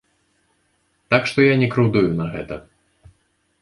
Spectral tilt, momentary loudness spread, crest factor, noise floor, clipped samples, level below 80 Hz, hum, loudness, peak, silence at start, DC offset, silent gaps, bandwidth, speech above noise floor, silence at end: -7 dB/octave; 16 LU; 20 dB; -66 dBFS; under 0.1%; -50 dBFS; none; -18 LUFS; -2 dBFS; 1.1 s; under 0.1%; none; 11 kHz; 48 dB; 1 s